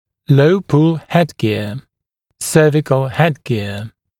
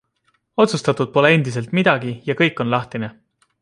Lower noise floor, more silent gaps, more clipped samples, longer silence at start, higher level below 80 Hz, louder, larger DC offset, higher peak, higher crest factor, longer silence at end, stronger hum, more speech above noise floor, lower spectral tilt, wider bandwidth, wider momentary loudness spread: first, -73 dBFS vs -66 dBFS; neither; neither; second, 0.3 s vs 0.6 s; first, -52 dBFS vs -60 dBFS; first, -15 LUFS vs -18 LUFS; neither; about the same, 0 dBFS vs -2 dBFS; about the same, 16 dB vs 18 dB; second, 0.3 s vs 0.5 s; neither; first, 59 dB vs 48 dB; about the same, -6.5 dB/octave vs -6 dB/octave; first, 16 kHz vs 11.5 kHz; about the same, 13 LU vs 13 LU